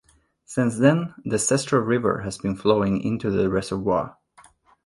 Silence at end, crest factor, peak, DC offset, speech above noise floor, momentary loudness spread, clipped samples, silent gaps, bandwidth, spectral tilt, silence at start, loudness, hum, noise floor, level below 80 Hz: 0.75 s; 18 dB; -4 dBFS; under 0.1%; 33 dB; 7 LU; under 0.1%; none; 11.5 kHz; -5.5 dB/octave; 0.5 s; -23 LUFS; none; -55 dBFS; -50 dBFS